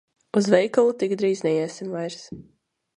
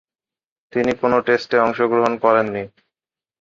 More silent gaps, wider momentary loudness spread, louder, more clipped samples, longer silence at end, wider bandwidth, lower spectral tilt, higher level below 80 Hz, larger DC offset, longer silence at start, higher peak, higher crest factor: neither; first, 17 LU vs 10 LU; second, -23 LUFS vs -18 LUFS; neither; second, 0.55 s vs 0.75 s; first, 10.5 kHz vs 7.4 kHz; about the same, -5.5 dB/octave vs -6.5 dB/octave; second, -66 dBFS vs -58 dBFS; neither; second, 0.35 s vs 0.75 s; about the same, -4 dBFS vs -2 dBFS; about the same, 20 dB vs 18 dB